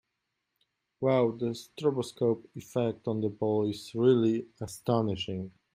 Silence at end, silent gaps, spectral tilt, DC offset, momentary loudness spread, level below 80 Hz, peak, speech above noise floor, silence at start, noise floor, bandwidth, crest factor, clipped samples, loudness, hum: 0.25 s; none; -7 dB/octave; under 0.1%; 10 LU; -68 dBFS; -12 dBFS; 54 dB; 1 s; -83 dBFS; 15.5 kHz; 18 dB; under 0.1%; -30 LUFS; none